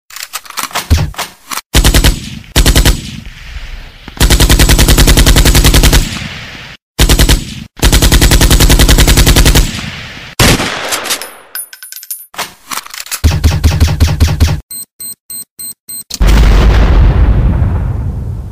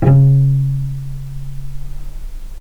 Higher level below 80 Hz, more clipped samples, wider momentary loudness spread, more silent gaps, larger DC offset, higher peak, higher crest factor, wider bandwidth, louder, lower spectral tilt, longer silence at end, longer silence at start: first, -12 dBFS vs -26 dBFS; first, 0.2% vs under 0.1%; second, 17 LU vs 24 LU; first, 1.66-1.70 s, 6.82-6.95 s, 14.63-14.69 s, 14.91-14.99 s, 15.20-15.29 s, 15.50-15.57 s, 15.80-15.87 s vs none; first, 0.4% vs under 0.1%; about the same, 0 dBFS vs 0 dBFS; about the same, 10 dB vs 14 dB; first, 16.5 kHz vs 2.8 kHz; first, -9 LUFS vs -14 LUFS; second, -4 dB/octave vs -10 dB/octave; about the same, 0 s vs 0 s; about the same, 0.1 s vs 0 s